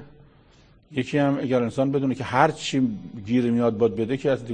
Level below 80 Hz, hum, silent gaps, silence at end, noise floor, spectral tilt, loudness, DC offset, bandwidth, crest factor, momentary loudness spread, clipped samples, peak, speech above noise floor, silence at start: -58 dBFS; none; none; 0 s; -55 dBFS; -6.5 dB/octave; -23 LUFS; under 0.1%; 9.6 kHz; 22 dB; 6 LU; under 0.1%; -2 dBFS; 32 dB; 0 s